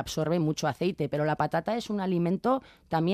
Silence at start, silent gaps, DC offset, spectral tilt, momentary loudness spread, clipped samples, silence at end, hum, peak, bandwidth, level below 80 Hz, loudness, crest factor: 0 s; none; under 0.1%; -6.5 dB/octave; 3 LU; under 0.1%; 0 s; none; -12 dBFS; 15 kHz; -58 dBFS; -29 LUFS; 16 dB